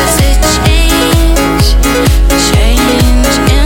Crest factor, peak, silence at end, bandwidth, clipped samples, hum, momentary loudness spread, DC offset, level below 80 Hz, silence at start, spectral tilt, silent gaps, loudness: 6 dB; 0 dBFS; 0 s; 17.5 kHz; 0.1%; none; 1 LU; under 0.1%; -10 dBFS; 0 s; -4.5 dB/octave; none; -8 LUFS